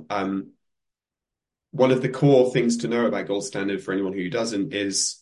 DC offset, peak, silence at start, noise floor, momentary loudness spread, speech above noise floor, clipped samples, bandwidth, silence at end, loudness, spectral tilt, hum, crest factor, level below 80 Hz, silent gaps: under 0.1%; -6 dBFS; 0 s; -88 dBFS; 9 LU; 66 dB; under 0.1%; 11.5 kHz; 0.1 s; -23 LUFS; -5 dB/octave; none; 18 dB; -64 dBFS; none